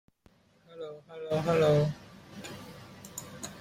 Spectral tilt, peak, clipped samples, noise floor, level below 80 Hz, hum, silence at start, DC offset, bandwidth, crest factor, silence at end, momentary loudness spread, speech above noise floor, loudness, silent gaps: -6 dB/octave; -14 dBFS; under 0.1%; -64 dBFS; -62 dBFS; none; 0.7 s; under 0.1%; 16 kHz; 18 dB; 0 s; 22 LU; 36 dB; -28 LUFS; none